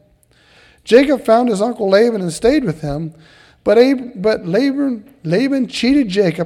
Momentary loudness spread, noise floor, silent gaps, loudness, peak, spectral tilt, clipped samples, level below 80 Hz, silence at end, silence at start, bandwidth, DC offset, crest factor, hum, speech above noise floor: 11 LU; -53 dBFS; none; -15 LUFS; 0 dBFS; -6 dB/octave; under 0.1%; -46 dBFS; 0 s; 0.85 s; 13.5 kHz; under 0.1%; 16 dB; none; 38 dB